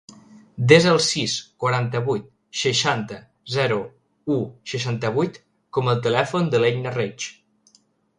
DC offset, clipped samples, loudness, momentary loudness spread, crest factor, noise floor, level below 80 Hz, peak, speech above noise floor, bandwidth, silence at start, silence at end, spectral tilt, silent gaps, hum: under 0.1%; under 0.1%; -21 LUFS; 15 LU; 22 dB; -61 dBFS; -60 dBFS; 0 dBFS; 40 dB; 11.5 kHz; 0.55 s; 0.85 s; -4.5 dB/octave; none; none